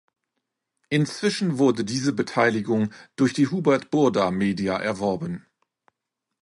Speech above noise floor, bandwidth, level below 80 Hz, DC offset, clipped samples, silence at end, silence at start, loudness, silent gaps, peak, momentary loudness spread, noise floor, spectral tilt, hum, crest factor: 61 dB; 11.5 kHz; -60 dBFS; under 0.1%; under 0.1%; 1.05 s; 0.9 s; -23 LUFS; none; -6 dBFS; 6 LU; -83 dBFS; -6 dB/octave; none; 18 dB